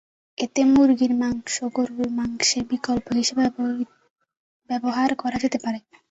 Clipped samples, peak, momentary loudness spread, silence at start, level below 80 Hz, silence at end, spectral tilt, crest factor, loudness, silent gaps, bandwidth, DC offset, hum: under 0.1%; -8 dBFS; 13 LU; 0.4 s; -56 dBFS; 0.3 s; -3 dB/octave; 14 dB; -23 LUFS; 4.10-4.16 s, 4.37-4.60 s; 8.2 kHz; under 0.1%; none